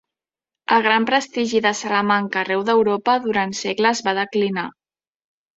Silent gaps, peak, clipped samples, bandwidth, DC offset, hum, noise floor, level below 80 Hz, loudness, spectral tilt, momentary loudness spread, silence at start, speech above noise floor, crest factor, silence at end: none; -2 dBFS; under 0.1%; 8 kHz; under 0.1%; none; -88 dBFS; -66 dBFS; -19 LUFS; -4 dB/octave; 6 LU; 0.7 s; 69 dB; 18 dB; 0.9 s